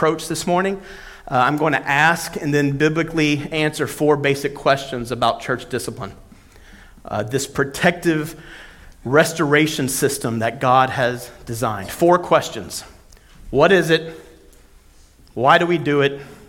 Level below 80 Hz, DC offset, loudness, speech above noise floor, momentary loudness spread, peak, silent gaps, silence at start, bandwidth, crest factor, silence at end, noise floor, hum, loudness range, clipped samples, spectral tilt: -46 dBFS; under 0.1%; -19 LUFS; 30 dB; 16 LU; 0 dBFS; none; 0 s; 17.5 kHz; 20 dB; 0.15 s; -48 dBFS; none; 5 LU; under 0.1%; -4.5 dB/octave